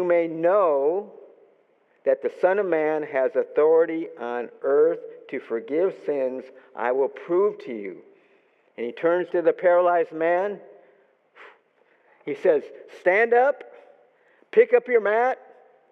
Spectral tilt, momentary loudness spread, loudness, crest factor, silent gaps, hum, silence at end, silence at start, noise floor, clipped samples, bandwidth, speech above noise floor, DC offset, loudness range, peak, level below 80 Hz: -7.5 dB/octave; 15 LU; -23 LUFS; 18 dB; none; none; 0.55 s; 0 s; -63 dBFS; under 0.1%; 5.8 kHz; 40 dB; under 0.1%; 4 LU; -6 dBFS; under -90 dBFS